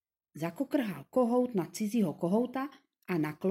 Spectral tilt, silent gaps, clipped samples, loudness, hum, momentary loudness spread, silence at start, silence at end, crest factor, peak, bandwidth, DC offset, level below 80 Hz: -7 dB/octave; none; under 0.1%; -32 LUFS; none; 11 LU; 0.35 s; 0 s; 16 dB; -16 dBFS; 16.5 kHz; under 0.1%; -76 dBFS